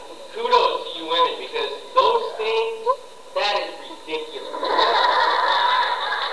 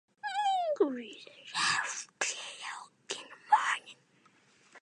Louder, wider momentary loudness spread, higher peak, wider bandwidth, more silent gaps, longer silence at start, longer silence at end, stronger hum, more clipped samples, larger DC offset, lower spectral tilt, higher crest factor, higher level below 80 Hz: first, -21 LUFS vs -33 LUFS; about the same, 12 LU vs 14 LU; first, -4 dBFS vs -12 dBFS; about the same, 11 kHz vs 11.5 kHz; neither; second, 0 s vs 0.25 s; about the same, 0 s vs 0.05 s; neither; neither; first, 0.6% vs under 0.1%; about the same, -1 dB/octave vs -1 dB/octave; about the same, 18 dB vs 22 dB; first, -62 dBFS vs -88 dBFS